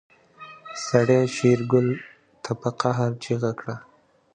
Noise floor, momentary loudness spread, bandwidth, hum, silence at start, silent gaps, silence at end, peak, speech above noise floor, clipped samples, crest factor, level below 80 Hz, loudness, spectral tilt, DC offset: -46 dBFS; 19 LU; 9.6 kHz; none; 0.4 s; none; 0.5 s; -4 dBFS; 24 dB; under 0.1%; 20 dB; -64 dBFS; -23 LUFS; -6.5 dB/octave; under 0.1%